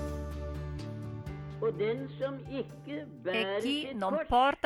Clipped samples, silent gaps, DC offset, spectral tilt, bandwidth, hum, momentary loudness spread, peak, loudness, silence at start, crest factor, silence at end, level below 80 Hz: under 0.1%; none; under 0.1%; -6 dB/octave; 14 kHz; none; 12 LU; -14 dBFS; -34 LUFS; 0 s; 18 dB; 0.1 s; -48 dBFS